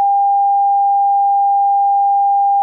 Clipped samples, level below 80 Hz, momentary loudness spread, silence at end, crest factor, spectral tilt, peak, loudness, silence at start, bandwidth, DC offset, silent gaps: under 0.1%; under -90 dBFS; 0 LU; 0 s; 4 dB; -3 dB/octave; -10 dBFS; -13 LUFS; 0 s; 1 kHz; under 0.1%; none